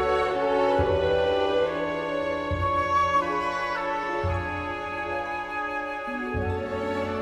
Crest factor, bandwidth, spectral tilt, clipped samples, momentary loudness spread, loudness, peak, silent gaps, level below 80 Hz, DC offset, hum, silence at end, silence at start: 14 dB; 12 kHz; -6 dB/octave; under 0.1%; 7 LU; -26 LUFS; -12 dBFS; none; -44 dBFS; under 0.1%; none; 0 s; 0 s